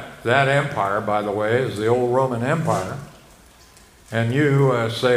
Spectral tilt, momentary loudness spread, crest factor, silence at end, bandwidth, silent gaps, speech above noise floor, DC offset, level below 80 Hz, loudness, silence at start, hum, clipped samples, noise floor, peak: -6.5 dB/octave; 7 LU; 18 dB; 0 s; 15.5 kHz; none; 29 dB; under 0.1%; -54 dBFS; -20 LUFS; 0 s; none; under 0.1%; -49 dBFS; -2 dBFS